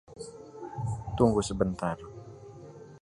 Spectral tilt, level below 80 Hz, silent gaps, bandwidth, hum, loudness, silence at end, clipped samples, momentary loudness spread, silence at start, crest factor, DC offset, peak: -6.5 dB/octave; -48 dBFS; none; 11.5 kHz; none; -30 LUFS; 0.05 s; under 0.1%; 22 LU; 0.1 s; 24 dB; under 0.1%; -8 dBFS